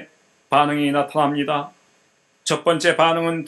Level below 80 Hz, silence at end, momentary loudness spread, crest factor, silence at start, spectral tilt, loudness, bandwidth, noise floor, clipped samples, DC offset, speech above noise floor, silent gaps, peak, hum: -68 dBFS; 0 s; 8 LU; 20 dB; 0 s; -4.5 dB/octave; -19 LUFS; 12 kHz; -61 dBFS; under 0.1%; under 0.1%; 42 dB; none; 0 dBFS; none